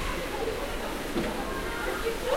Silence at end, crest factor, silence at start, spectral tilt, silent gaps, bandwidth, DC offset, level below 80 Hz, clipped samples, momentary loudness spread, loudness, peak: 0 s; 14 dB; 0 s; -4 dB/octave; none; 16 kHz; under 0.1%; -40 dBFS; under 0.1%; 2 LU; -32 LUFS; -16 dBFS